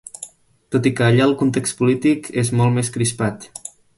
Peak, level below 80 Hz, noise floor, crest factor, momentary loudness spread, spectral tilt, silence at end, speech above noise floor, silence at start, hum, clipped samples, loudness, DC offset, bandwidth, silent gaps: -2 dBFS; -52 dBFS; -41 dBFS; 16 dB; 18 LU; -5.5 dB/octave; 0.3 s; 24 dB; 0.2 s; none; under 0.1%; -18 LUFS; under 0.1%; 11.5 kHz; none